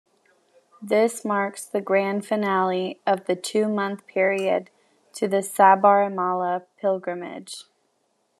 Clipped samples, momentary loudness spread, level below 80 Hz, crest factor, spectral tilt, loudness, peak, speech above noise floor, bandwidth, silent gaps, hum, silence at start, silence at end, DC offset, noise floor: under 0.1%; 15 LU; -84 dBFS; 20 dB; -5 dB/octave; -23 LUFS; -4 dBFS; 47 dB; 13 kHz; none; none; 0.8 s; 0.75 s; under 0.1%; -70 dBFS